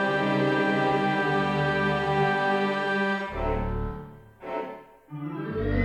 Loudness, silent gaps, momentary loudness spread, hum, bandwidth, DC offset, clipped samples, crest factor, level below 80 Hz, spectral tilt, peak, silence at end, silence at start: -26 LUFS; none; 15 LU; none; 10 kHz; under 0.1%; under 0.1%; 14 dB; -40 dBFS; -7 dB/octave; -12 dBFS; 0 s; 0 s